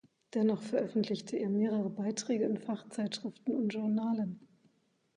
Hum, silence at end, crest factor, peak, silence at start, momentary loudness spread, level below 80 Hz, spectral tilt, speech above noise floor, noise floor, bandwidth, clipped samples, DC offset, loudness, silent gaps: none; 0.7 s; 14 dB; -20 dBFS; 0.35 s; 6 LU; -82 dBFS; -6 dB/octave; 39 dB; -73 dBFS; 10.5 kHz; under 0.1%; under 0.1%; -34 LUFS; none